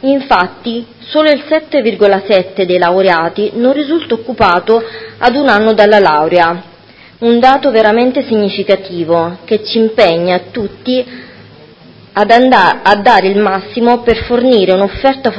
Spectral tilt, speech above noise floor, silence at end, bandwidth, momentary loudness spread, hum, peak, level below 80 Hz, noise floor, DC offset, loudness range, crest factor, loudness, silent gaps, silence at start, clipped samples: -6.5 dB/octave; 29 dB; 0 s; 8 kHz; 9 LU; none; 0 dBFS; -40 dBFS; -39 dBFS; under 0.1%; 4 LU; 10 dB; -10 LUFS; none; 0.05 s; 0.7%